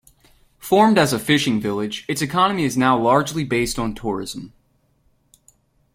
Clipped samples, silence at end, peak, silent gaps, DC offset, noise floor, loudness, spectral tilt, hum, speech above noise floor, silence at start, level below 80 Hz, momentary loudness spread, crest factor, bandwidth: under 0.1%; 1.45 s; -2 dBFS; none; under 0.1%; -62 dBFS; -19 LUFS; -4.5 dB/octave; none; 43 dB; 0.6 s; -48 dBFS; 11 LU; 18 dB; 16.5 kHz